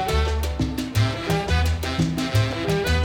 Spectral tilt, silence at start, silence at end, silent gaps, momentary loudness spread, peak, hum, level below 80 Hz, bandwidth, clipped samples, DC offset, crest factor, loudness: -5.5 dB/octave; 0 s; 0 s; none; 3 LU; -8 dBFS; none; -30 dBFS; 19 kHz; under 0.1%; under 0.1%; 12 dB; -23 LUFS